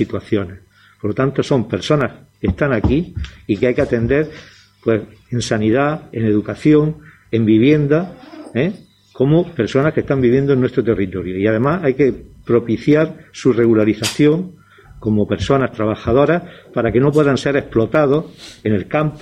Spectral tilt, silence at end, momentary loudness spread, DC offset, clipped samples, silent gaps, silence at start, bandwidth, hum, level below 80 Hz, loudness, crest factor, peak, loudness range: -7 dB/octave; 0.05 s; 10 LU; under 0.1%; under 0.1%; none; 0 s; 14 kHz; none; -38 dBFS; -17 LUFS; 16 dB; -2 dBFS; 3 LU